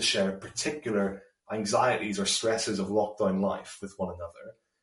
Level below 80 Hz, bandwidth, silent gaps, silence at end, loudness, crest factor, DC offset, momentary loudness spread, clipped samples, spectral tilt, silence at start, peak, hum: -64 dBFS; 11.5 kHz; none; 0.3 s; -29 LUFS; 18 dB; under 0.1%; 15 LU; under 0.1%; -3.5 dB/octave; 0 s; -12 dBFS; none